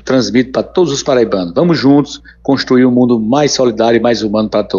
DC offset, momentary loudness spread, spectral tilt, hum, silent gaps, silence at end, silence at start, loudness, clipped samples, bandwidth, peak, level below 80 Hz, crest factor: under 0.1%; 5 LU; -5.5 dB/octave; none; none; 0 s; 0.05 s; -12 LUFS; under 0.1%; 7.4 kHz; 0 dBFS; -42 dBFS; 12 dB